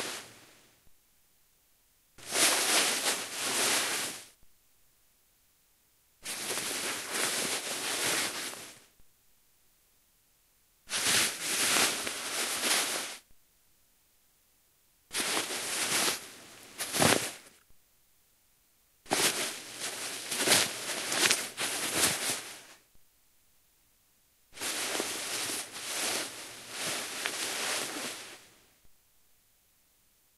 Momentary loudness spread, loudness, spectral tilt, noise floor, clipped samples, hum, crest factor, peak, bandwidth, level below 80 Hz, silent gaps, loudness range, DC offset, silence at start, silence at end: 16 LU; -29 LUFS; -0.5 dB/octave; -68 dBFS; under 0.1%; none; 30 dB; -4 dBFS; 16 kHz; -72 dBFS; none; 7 LU; under 0.1%; 0 s; 1.45 s